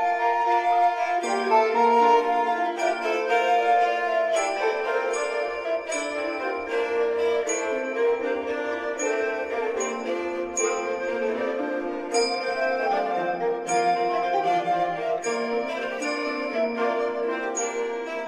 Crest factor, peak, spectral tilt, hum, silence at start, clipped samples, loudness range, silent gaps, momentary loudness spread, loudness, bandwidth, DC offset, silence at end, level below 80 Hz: 16 dB; -8 dBFS; -2.5 dB/octave; none; 0 s; under 0.1%; 5 LU; none; 7 LU; -25 LUFS; 10 kHz; under 0.1%; 0 s; -66 dBFS